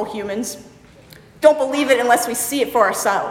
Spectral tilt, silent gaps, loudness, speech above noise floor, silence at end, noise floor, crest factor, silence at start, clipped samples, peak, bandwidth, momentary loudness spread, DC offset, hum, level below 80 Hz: -2.5 dB/octave; none; -17 LUFS; 27 dB; 0 s; -45 dBFS; 18 dB; 0 s; under 0.1%; 0 dBFS; 17 kHz; 11 LU; under 0.1%; none; -56 dBFS